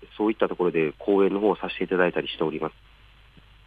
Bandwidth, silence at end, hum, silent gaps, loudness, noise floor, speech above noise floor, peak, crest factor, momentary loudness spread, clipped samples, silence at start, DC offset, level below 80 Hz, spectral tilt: 4.8 kHz; 0.95 s; none; none; -25 LUFS; -53 dBFS; 28 dB; -8 dBFS; 18 dB; 6 LU; under 0.1%; 0 s; under 0.1%; -56 dBFS; -8 dB/octave